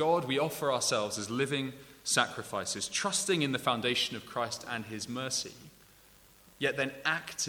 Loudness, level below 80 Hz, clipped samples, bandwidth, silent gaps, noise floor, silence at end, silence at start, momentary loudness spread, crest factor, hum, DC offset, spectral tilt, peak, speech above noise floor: -32 LUFS; -68 dBFS; under 0.1%; over 20 kHz; none; -59 dBFS; 0 s; 0 s; 8 LU; 24 dB; none; under 0.1%; -2.5 dB/octave; -8 dBFS; 27 dB